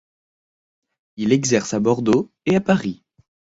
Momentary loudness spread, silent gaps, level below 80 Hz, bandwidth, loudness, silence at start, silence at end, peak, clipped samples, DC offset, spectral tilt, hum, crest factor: 9 LU; none; -56 dBFS; 8 kHz; -20 LUFS; 1.15 s; 0.65 s; -4 dBFS; under 0.1%; under 0.1%; -5.5 dB/octave; none; 18 dB